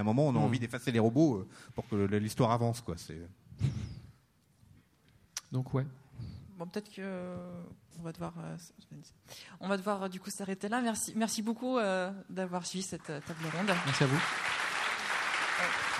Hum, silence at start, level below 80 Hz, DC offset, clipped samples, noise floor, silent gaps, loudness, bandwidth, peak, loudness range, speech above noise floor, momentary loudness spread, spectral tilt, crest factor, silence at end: none; 0 s; -62 dBFS; under 0.1%; under 0.1%; -67 dBFS; none; -33 LUFS; 15.5 kHz; -14 dBFS; 10 LU; 34 dB; 18 LU; -5 dB/octave; 20 dB; 0 s